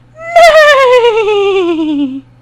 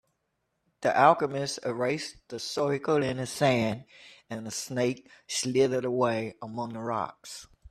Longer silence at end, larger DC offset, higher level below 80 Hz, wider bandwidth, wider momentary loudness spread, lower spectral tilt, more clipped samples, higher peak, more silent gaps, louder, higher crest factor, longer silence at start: first, 0.2 s vs 0 s; neither; first, -42 dBFS vs -66 dBFS; first, 19 kHz vs 14.5 kHz; second, 11 LU vs 16 LU; second, -3 dB/octave vs -4.5 dB/octave; first, 6% vs under 0.1%; first, 0 dBFS vs -6 dBFS; neither; first, -7 LUFS vs -28 LUFS; second, 8 dB vs 22 dB; second, 0.2 s vs 0.8 s